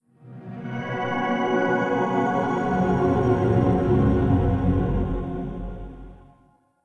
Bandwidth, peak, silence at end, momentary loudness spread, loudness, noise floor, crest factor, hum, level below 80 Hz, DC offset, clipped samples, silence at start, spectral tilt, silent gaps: 8.8 kHz; -8 dBFS; 0.7 s; 15 LU; -23 LUFS; -60 dBFS; 14 dB; none; -36 dBFS; under 0.1%; under 0.1%; 0.25 s; -8.5 dB/octave; none